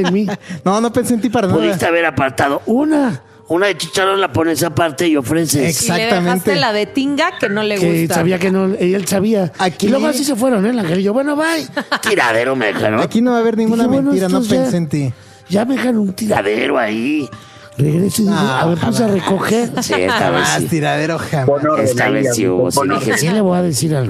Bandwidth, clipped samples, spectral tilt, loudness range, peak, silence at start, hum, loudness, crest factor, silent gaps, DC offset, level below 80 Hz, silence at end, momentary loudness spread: 15 kHz; under 0.1%; -5 dB/octave; 1 LU; 0 dBFS; 0 s; none; -15 LUFS; 14 dB; none; under 0.1%; -52 dBFS; 0 s; 4 LU